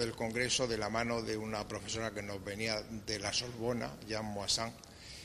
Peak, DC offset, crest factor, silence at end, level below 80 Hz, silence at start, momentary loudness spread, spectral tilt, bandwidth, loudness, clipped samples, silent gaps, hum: -18 dBFS; under 0.1%; 20 dB; 0 s; -58 dBFS; 0 s; 8 LU; -3 dB/octave; 13.5 kHz; -36 LUFS; under 0.1%; none; none